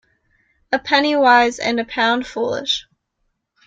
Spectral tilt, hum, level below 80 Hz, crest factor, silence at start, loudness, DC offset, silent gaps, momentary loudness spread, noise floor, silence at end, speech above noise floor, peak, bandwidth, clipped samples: -2.5 dB/octave; none; -56 dBFS; 18 dB; 0.7 s; -17 LUFS; under 0.1%; none; 10 LU; -71 dBFS; 0.85 s; 54 dB; -2 dBFS; 9 kHz; under 0.1%